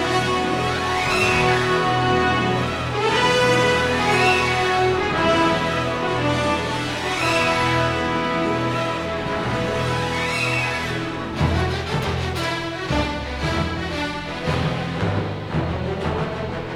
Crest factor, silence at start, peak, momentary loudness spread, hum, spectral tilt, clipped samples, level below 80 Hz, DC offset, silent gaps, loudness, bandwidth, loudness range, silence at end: 16 dB; 0 s; -6 dBFS; 8 LU; none; -5 dB/octave; under 0.1%; -38 dBFS; under 0.1%; none; -21 LUFS; 16 kHz; 6 LU; 0 s